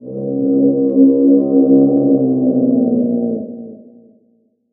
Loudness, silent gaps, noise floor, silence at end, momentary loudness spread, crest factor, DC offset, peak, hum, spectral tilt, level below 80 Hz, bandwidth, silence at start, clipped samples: -13 LUFS; none; -58 dBFS; 0.95 s; 11 LU; 14 dB; under 0.1%; 0 dBFS; none; -14.5 dB/octave; -62 dBFS; 1.3 kHz; 0 s; under 0.1%